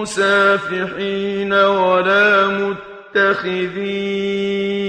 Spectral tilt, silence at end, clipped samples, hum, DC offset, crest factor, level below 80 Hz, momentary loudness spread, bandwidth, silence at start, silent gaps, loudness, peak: -4.5 dB/octave; 0 s; under 0.1%; none; under 0.1%; 14 dB; -56 dBFS; 9 LU; 10.5 kHz; 0 s; none; -16 LUFS; -2 dBFS